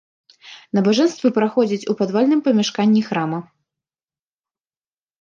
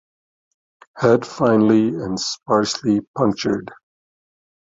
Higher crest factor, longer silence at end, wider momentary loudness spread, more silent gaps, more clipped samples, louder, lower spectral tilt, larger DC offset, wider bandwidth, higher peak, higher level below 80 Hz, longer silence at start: about the same, 16 dB vs 18 dB; first, 1.8 s vs 1.05 s; about the same, 7 LU vs 8 LU; second, none vs 3.07-3.14 s; neither; about the same, -18 LUFS vs -19 LUFS; about the same, -6 dB/octave vs -5.5 dB/octave; neither; about the same, 7.4 kHz vs 7.8 kHz; about the same, -4 dBFS vs -2 dBFS; second, -70 dBFS vs -56 dBFS; second, 0.45 s vs 0.95 s